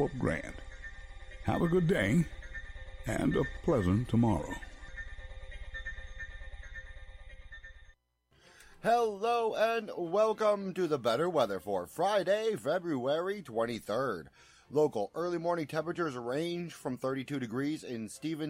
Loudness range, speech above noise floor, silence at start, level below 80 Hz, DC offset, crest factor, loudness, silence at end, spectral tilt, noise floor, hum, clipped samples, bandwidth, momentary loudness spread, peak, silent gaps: 12 LU; 38 dB; 0 s; -50 dBFS; under 0.1%; 16 dB; -32 LUFS; 0 s; -6.5 dB/octave; -70 dBFS; none; under 0.1%; 16 kHz; 19 LU; -16 dBFS; none